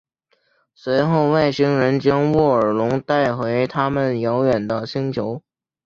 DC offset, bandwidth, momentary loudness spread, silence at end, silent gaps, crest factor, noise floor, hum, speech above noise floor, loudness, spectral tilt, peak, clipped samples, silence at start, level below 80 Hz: under 0.1%; 7.4 kHz; 7 LU; 0.45 s; none; 16 dB; -65 dBFS; none; 47 dB; -19 LUFS; -8 dB/octave; -4 dBFS; under 0.1%; 0.85 s; -52 dBFS